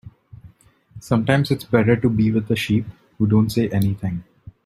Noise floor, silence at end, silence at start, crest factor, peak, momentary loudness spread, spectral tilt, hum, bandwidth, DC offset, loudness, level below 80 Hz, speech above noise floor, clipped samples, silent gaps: -51 dBFS; 0.15 s; 0.05 s; 18 dB; -2 dBFS; 8 LU; -7.5 dB/octave; none; 15.5 kHz; under 0.1%; -20 LUFS; -48 dBFS; 33 dB; under 0.1%; none